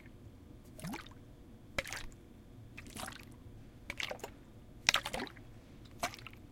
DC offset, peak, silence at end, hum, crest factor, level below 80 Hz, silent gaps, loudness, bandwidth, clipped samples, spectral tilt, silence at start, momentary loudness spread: under 0.1%; -4 dBFS; 0 s; none; 40 dB; -58 dBFS; none; -39 LUFS; 16.5 kHz; under 0.1%; -2 dB/octave; 0 s; 23 LU